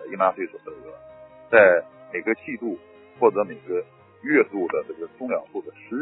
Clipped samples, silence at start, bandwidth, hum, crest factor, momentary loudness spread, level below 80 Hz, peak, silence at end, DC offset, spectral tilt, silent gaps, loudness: under 0.1%; 0 s; 4.1 kHz; none; 24 dB; 20 LU; -66 dBFS; 0 dBFS; 0 s; under 0.1%; -10 dB/octave; none; -23 LUFS